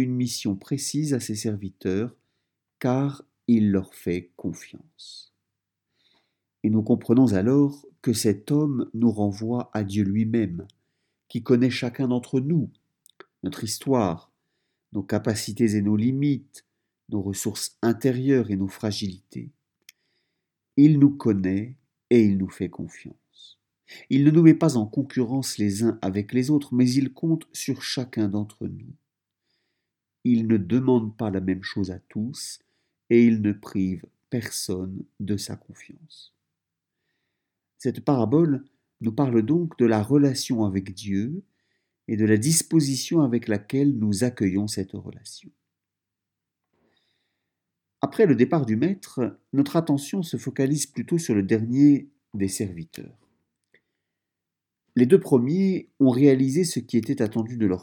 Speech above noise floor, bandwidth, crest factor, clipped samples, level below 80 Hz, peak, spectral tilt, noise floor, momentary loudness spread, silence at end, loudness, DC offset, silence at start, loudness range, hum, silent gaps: 63 dB; 18.5 kHz; 22 dB; under 0.1%; -66 dBFS; -2 dBFS; -6 dB/octave; -86 dBFS; 15 LU; 0 s; -23 LUFS; under 0.1%; 0 s; 7 LU; none; none